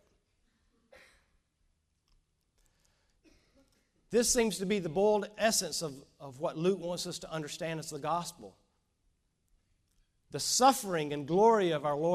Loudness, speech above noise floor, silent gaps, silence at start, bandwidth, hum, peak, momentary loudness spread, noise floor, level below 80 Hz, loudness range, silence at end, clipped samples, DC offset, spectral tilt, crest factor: -30 LUFS; 45 dB; none; 4.1 s; 15.5 kHz; none; -12 dBFS; 13 LU; -76 dBFS; -64 dBFS; 9 LU; 0 s; under 0.1%; under 0.1%; -3.5 dB/octave; 22 dB